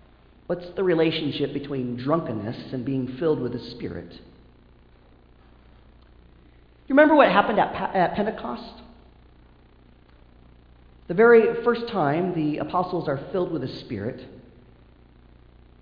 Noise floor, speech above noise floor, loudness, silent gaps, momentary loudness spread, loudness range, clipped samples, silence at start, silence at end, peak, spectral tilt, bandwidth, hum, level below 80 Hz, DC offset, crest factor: -53 dBFS; 31 dB; -23 LUFS; none; 17 LU; 10 LU; under 0.1%; 0.5 s; 1.4 s; -4 dBFS; -9 dB/octave; 5.2 kHz; none; -54 dBFS; under 0.1%; 22 dB